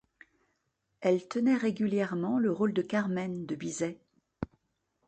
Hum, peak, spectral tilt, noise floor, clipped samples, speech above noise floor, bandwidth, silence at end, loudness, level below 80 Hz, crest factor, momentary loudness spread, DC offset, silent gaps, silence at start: none; -14 dBFS; -6.5 dB/octave; -79 dBFS; under 0.1%; 49 dB; 9.2 kHz; 0.6 s; -31 LUFS; -66 dBFS; 18 dB; 12 LU; under 0.1%; none; 1 s